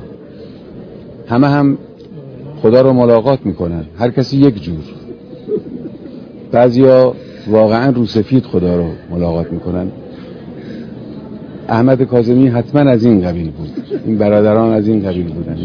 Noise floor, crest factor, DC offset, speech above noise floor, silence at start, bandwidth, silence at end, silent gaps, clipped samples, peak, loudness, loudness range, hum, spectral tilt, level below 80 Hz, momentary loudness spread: -33 dBFS; 14 dB; under 0.1%; 21 dB; 0 s; 5.4 kHz; 0 s; none; 0.4%; 0 dBFS; -13 LUFS; 6 LU; none; -9.5 dB/octave; -42 dBFS; 22 LU